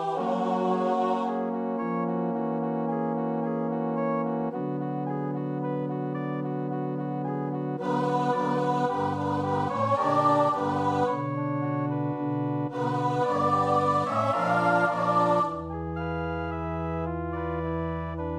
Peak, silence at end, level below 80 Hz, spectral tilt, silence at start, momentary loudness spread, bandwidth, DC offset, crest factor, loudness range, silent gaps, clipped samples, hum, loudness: -10 dBFS; 0 s; -52 dBFS; -8 dB/octave; 0 s; 8 LU; 11 kHz; under 0.1%; 16 dB; 5 LU; none; under 0.1%; none; -27 LUFS